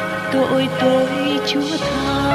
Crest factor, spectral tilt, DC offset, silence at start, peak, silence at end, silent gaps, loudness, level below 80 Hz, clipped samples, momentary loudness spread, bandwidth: 14 dB; -5 dB/octave; under 0.1%; 0 s; -4 dBFS; 0 s; none; -18 LUFS; -42 dBFS; under 0.1%; 4 LU; 15 kHz